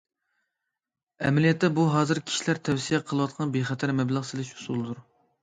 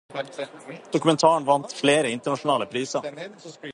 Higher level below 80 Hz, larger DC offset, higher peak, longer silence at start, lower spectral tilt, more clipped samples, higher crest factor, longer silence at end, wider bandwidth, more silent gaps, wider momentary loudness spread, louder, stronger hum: first, -64 dBFS vs -70 dBFS; neither; second, -10 dBFS vs -4 dBFS; first, 1.2 s vs 0.1 s; first, -5.5 dB/octave vs -4 dB/octave; neither; about the same, 18 dB vs 20 dB; first, 0.4 s vs 0 s; second, 9.4 kHz vs 11.5 kHz; neither; second, 10 LU vs 19 LU; second, -26 LUFS vs -23 LUFS; neither